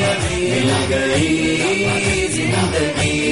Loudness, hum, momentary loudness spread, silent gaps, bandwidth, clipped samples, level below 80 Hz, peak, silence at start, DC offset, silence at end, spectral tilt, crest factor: -17 LUFS; none; 2 LU; none; 11.5 kHz; under 0.1%; -36 dBFS; -6 dBFS; 0 s; 0.2%; 0 s; -4.5 dB/octave; 12 dB